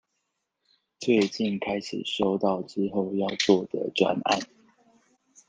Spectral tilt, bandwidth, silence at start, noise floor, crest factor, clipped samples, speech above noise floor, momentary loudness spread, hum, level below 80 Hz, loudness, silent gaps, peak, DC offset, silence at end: -5 dB/octave; 9.6 kHz; 1 s; -79 dBFS; 22 dB; under 0.1%; 54 dB; 7 LU; none; -66 dBFS; -26 LUFS; none; -6 dBFS; under 0.1%; 1.05 s